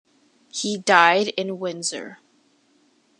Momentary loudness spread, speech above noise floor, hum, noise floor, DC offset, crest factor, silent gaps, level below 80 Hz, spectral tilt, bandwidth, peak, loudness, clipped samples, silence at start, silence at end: 19 LU; 41 dB; none; -62 dBFS; under 0.1%; 24 dB; none; -78 dBFS; -2.5 dB/octave; 11.5 kHz; 0 dBFS; -20 LUFS; under 0.1%; 0.55 s; 1.05 s